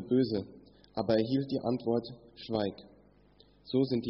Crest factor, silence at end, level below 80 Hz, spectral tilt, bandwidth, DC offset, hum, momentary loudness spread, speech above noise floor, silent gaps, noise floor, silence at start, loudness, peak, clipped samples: 18 dB; 0 s; -64 dBFS; -6.5 dB/octave; 5.8 kHz; under 0.1%; 50 Hz at -65 dBFS; 18 LU; 31 dB; none; -62 dBFS; 0 s; -32 LUFS; -14 dBFS; under 0.1%